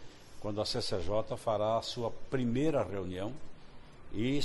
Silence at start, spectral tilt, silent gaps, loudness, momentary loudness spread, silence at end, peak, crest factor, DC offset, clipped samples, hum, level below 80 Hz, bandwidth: 0 s; -6 dB/octave; none; -35 LUFS; 12 LU; 0 s; -18 dBFS; 14 dB; under 0.1%; under 0.1%; none; -50 dBFS; 11.5 kHz